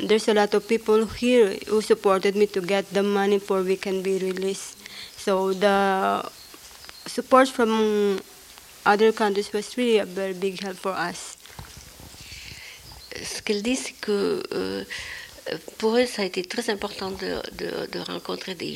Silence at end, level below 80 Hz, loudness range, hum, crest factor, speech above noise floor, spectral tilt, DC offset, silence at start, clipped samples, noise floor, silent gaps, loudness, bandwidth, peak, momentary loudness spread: 0 s; -56 dBFS; 8 LU; none; 22 dB; 23 dB; -4.5 dB/octave; under 0.1%; 0 s; under 0.1%; -47 dBFS; none; -24 LUFS; 16.5 kHz; -4 dBFS; 19 LU